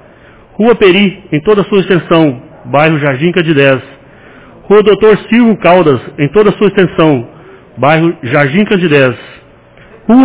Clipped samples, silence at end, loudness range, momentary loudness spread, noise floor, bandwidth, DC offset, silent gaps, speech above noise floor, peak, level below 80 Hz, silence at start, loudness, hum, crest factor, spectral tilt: 1%; 0 s; 2 LU; 7 LU; -38 dBFS; 4 kHz; under 0.1%; none; 31 dB; 0 dBFS; -42 dBFS; 0.6 s; -9 LUFS; none; 10 dB; -10.5 dB/octave